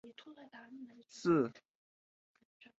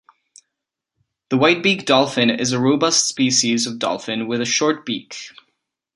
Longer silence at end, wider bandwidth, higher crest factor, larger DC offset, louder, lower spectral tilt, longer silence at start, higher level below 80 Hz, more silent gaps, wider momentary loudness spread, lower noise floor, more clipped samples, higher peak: first, 1.25 s vs 0.65 s; second, 8 kHz vs 11.5 kHz; about the same, 20 dB vs 20 dB; neither; second, -35 LUFS vs -18 LUFS; first, -6.5 dB/octave vs -3 dB/octave; second, 0.05 s vs 1.3 s; second, -84 dBFS vs -64 dBFS; neither; first, 23 LU vs 11 LU; first, under -90 dBFS vs -82 dBFS; neither; second, -20 dBFS vs 0 dBFS